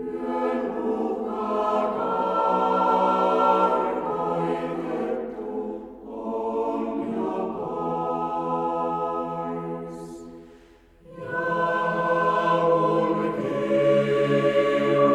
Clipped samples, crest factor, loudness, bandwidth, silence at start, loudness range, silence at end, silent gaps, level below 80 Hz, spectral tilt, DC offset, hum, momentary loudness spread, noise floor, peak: under 0.1%; 18 dB; -24 LUFS; 11 kHz; 0 s; 7 LU; 0 s; none; -58 dBFS; -7 dB/octave; under 0.1%; none; 11 LU; -53 dBFS; -6 dBFS